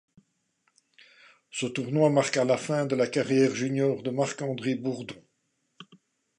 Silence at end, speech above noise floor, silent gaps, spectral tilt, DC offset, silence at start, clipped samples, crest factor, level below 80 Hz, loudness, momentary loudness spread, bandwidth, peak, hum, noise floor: 0.55 s; 49 dB; none; -5.5 dB/octave; under 0.1%; 1.55 s; under 0.1%; 20 dB; -74 dBFS; -27 LUFS; 11 LU; 11 kHz; -8 dBFS; none; -75 dBFS